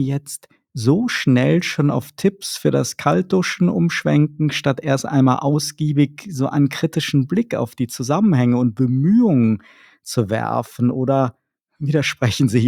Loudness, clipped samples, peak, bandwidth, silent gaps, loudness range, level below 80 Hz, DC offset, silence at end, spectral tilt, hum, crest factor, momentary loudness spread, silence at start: -19 LUFS; under 0.1%; 0 dBFS; 16 kHz; none; 1 LU; -58 dBFS; under 0.1%; 0 s; -6 dB/octave; none; 18 dB; 8 LU; 0 s